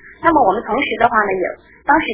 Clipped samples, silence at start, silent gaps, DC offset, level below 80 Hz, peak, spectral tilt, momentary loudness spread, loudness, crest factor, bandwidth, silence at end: under 0.1%; 0.05 s; none; under 0.1%; -46 dBFS; 0 dBFS; -8.5 dB/octave; 9 LU; -16 LUFS; 16 dB; 4 kHz; 0 s